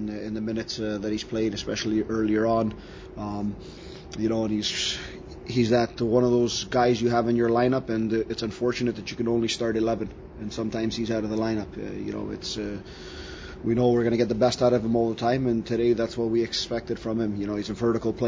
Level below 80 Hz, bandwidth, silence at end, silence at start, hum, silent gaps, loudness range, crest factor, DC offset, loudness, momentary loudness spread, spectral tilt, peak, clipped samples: -48 dBFS; 8 kHz; 0 s; 0 s; none; none; 5 LU; 18 dB; under 0.1%; -26 LUFS; 13 LU; -5.5 dB/octave; -8 dBFS; under 0.1%